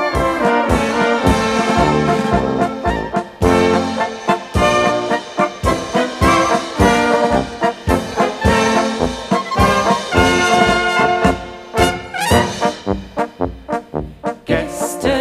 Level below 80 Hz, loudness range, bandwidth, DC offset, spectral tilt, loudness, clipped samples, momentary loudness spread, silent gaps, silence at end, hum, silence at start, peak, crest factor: -30 dBFS; 3 LU; 15.5 kHz; under 0.1%; -5 dB/octave; -16 LUFS; under 0.1%; 9 LU; none; 0 s; none; 0 s; 0 dBFS; 14 dB